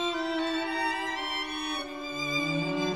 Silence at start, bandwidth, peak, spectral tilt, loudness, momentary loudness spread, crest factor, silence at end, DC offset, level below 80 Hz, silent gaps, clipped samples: 0 s; 15.5 kHz; -16 dBFS; -4 dB/octave; -30 LUFS; 5 LU; 14 dB; 0 s; 0.1%; -62 dBFS; none; under 0.1%